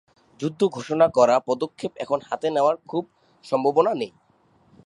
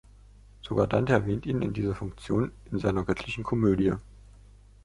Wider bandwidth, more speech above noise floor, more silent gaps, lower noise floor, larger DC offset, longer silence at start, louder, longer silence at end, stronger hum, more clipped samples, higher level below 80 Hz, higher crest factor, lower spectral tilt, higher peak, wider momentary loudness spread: about the same, 11.5 kHz vs 11.5 kHz; first, 38 dB vs 26 dB; neither; first, -60 dBFS vs -53 dBFS; neither; second, 0.4 s vs 0.65 s; first, -23 LUFS vs -28 LUFS; about the same, 0.8 s vs 0.8 s; second, none vs 50 Hz at -45 dBFS; neither; second, -68 dBFS vs -46 dBFS; about the same, 20 dB vs 22 dB; second, -6 dB/octave vs -8 dB/octave; first, -4 dBFS vs -8 dBFS; first, 12 LU vs 8 LU